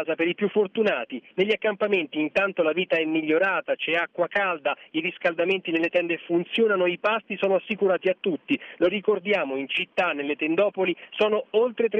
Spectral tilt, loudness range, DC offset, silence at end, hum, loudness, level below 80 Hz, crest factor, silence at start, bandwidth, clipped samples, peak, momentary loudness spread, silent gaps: -6.5 dB/octave; 1 LU; under 0.1%; 0 s; none; -24 LUFS; -70 dBFS; 14 dB; 0 s; 7 kHz; under 0.1%; -10 dBFS; 4 LU; none